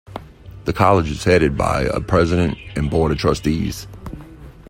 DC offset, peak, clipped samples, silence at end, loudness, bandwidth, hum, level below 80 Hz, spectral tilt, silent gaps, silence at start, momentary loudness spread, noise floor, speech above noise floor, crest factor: under 0.1%; 0 dBFS; under 0.1%; 0 s; -18 LUFS; 16.5 kHz; none; -34 dBFS; -6.5 dB/octave; none; 0.1 s; 20 LU; -39 dBFS; 21 dB; 18 dB